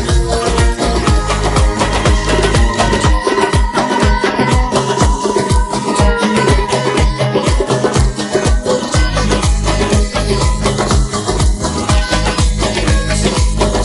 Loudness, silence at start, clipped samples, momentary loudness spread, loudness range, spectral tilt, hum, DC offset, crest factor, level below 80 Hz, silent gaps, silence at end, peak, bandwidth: -14 LUFS; 0 s; under 0.1%; 2 LU; 1 LU; -5 dB/octave; none; under 0.1%; 12 dB; -16 dBFS; none; 0 s; 0 dBFS; 11.5 kHz